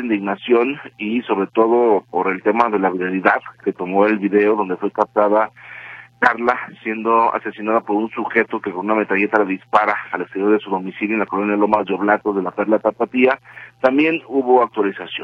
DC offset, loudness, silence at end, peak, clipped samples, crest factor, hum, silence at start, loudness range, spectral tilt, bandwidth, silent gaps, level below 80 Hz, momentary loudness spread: under 0.1%; -18 LUFS; 0 s; 0 dBFS; under 0.1%; 18 dB; none; 0 s; 2 LU; -7.5 dB/octave; 7 kHz; none; -62 dBFS; 8 LU